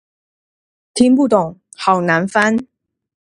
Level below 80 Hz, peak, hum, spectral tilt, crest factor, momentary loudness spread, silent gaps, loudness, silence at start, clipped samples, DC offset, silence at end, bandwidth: -56 dBFS; 0 dBFS; none; -5.5 dB/octave; 18 dB; 10 LU; none; -15 LUFS; 0.95 s; under 0.1%; under 0.1%; 0.7 s; 11 kHz